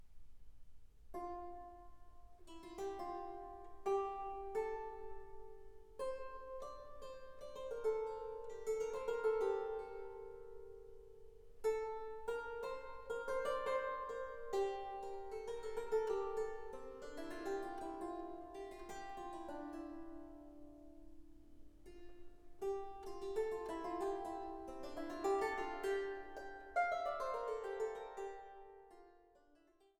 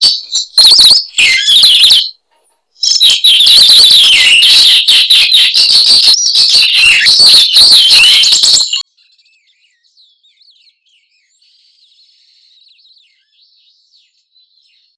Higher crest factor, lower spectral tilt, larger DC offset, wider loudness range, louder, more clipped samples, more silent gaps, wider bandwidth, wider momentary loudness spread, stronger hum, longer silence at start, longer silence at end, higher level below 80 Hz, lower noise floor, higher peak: first, 20 dB vs 8 dB; first, -4.5 dB/octave vs 3 dB/octave; neither; first, 9 LU vs 5 LU; second, -44 LUFS vs -2 LUFS; second, under 0.1% vs 2%; neither; first, 15.5 kHz vs 11 kHz; first, 20 LU vs 7 LU; neither; about the same, 0 s vs 0 s; second, 0.45 s vs 6.15 s; second, -62 dBFS vs -48 dBFS; first, -71 dBFS vs -57 dBFS; second, -26 dBFS vs 0 dBFS